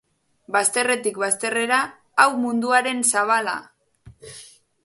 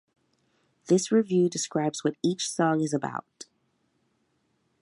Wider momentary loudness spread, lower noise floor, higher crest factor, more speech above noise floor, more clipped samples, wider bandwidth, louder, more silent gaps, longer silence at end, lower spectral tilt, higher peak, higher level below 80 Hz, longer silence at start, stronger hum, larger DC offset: first, 17 LU vs 10 LU; second, -50 dBFS vs -72 dBFS; about the same, 22 dB vs 18 dB; second, 29 dB vs 47 dB; neither; about the same, 12 kHz vs 11.5 kHz; first, -20 LUFS vs -26 LUFS; neither; second, 0.4 s vs 1.4 s; second, -1.5 dB/octave vs -5 dB/octave; first, 0 dBFS vs -10 dBFS; first, -66 dBFS vs -78 dBFS; second, 0.5 s vs 0.85 s; neither; neither